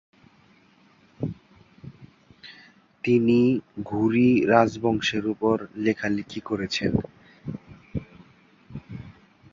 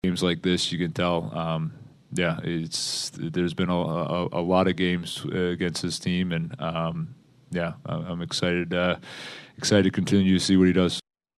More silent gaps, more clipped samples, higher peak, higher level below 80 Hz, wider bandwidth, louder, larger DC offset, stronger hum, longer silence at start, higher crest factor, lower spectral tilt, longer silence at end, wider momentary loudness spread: neither; neither; about the same, -4 dBFS vs -6 dBFS; about the same, -52 dBFS vs -56 dBFS; second, 7.4 kHz vs 12.5 kHz; about the same, -24 LUFS vs -25 LUFS; neither; neither; first, 1.2 s vs 0.05 s; about the same, 22 dB vs 20 dB; first, -6.5 dB/octave vs -5 dB/octave; about the same, 0.4 s vs 0.35 s; first, 24 LU vs 11 LU